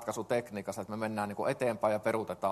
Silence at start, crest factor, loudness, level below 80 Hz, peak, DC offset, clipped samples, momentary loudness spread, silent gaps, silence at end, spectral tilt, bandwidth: 0 s; 18 dB; -34 LUFS; -70 dBFS; -14 dBFS; under 0.1%; under 0.1%; 8 LU; none; 0 s; -5.5 dB/octave; 13 kHz